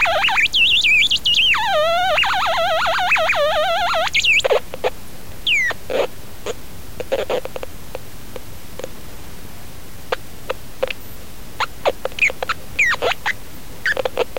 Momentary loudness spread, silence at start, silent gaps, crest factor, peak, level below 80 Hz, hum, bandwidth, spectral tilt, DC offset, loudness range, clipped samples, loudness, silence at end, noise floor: 24 LU; 0 s; none; 16 dB; -2 dBFS; -42 dBFS; none; 17 kHz; -1.5 dB/octave; 4%; 16 LU; under 0.1%; -17 LUFS; 0 s; -37 dBFS